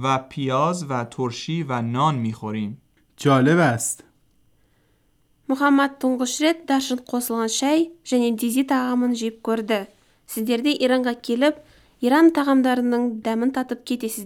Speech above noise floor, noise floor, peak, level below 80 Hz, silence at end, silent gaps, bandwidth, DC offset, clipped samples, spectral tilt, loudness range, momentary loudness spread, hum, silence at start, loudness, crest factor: 42 dB; -62 dBFS; -6 dBFS; -66 dBFS; 0 s; none; 17.5 kHz; under 0.1%; under 0.1%; -5 dB/octave; 3 LU; 10 LU; none; 0 s; -21 LUFS; 16 dB